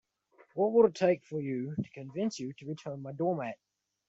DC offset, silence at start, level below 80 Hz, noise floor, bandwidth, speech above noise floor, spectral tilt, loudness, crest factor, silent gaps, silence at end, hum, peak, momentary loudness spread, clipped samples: under 0.1%; 0.55 s; -74 dBFS; -65 dBFS; 8 kHz; 34 dB; -7 dB/octave; -32 LUFS; 20 dB; none; 0.55 s; none; -12 dBFS; 16 LU; under 0.1%